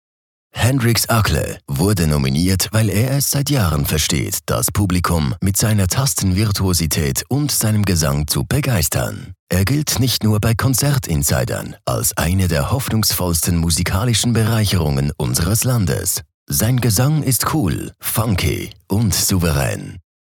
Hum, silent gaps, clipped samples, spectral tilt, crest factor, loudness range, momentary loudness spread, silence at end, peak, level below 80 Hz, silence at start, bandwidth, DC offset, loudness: none; 9.39-9.47 s, 16.34-16.46 s; under 0.1%; -4.5 dB/octave; 14 dB; 1 LU; 5 LU; 0.2 s; -4 dBFS; -34 dBFS; 0.55 s; 19 kHz; under 0.1%; -17 LUFS